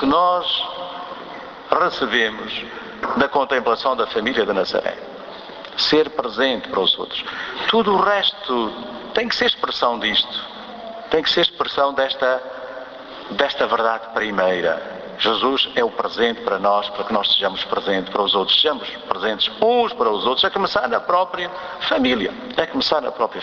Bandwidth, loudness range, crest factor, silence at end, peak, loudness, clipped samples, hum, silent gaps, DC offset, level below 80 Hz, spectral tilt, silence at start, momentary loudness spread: 7.2 kHz; 3 LU; 20 dB; 0 s; 0 dBFS; -19 LUFS; under 0.1%; none; none; under 0.1%; -54 dBFS; -4 dB/octave; 0 s; 14 LU